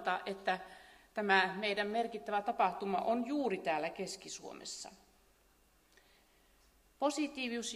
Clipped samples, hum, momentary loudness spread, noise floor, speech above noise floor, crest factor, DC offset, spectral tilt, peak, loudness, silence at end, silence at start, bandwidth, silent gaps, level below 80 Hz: under 0.1%; none; 14 LU; -69 dBFS; 33 dB; 24 dB; under 0.1%; -3.5 dB/octave; -14 dBFS; -36 LUFS; 0 s; 0 s; 15.5 kHz; none; -74 dBFS